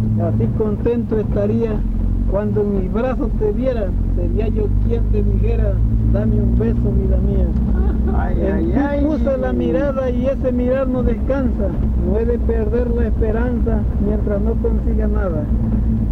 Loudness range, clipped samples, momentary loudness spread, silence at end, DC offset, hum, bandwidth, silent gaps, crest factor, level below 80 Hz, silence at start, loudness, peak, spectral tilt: 1 LU; under 0.1%; 2 LU; 0 s; under 0.1%; none; 4.2 kHz; none; 12 dB; -20 dBFS; 0 s; -18 LUFS; -4 dBFS; -11 dB/octave